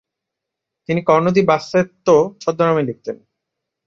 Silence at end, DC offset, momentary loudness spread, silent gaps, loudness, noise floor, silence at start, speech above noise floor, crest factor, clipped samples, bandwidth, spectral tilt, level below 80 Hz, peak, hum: 0.7 s; under 0.1%; 16 LU; none; -17 LUFS; -82 dBFS; 0.9 s; 66 dB; 18 dB; under 0.1%; 7.6 kHz; -6.5 dB/octave; -58 dBFS; 0 dBFS; none